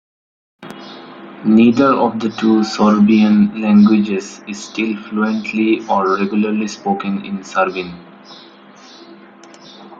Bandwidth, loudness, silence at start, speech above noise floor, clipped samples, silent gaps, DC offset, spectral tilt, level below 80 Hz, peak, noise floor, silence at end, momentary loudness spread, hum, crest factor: 7.6 kHz; -15 LUFS; 0.6 s; 27 dB; under 0.1%; none; under 0.1%; -6.5 dB/octave; -58 dBFS; -2 dBFS; -41 dBFS; 0.05 s; 19 LU; none; 14 dB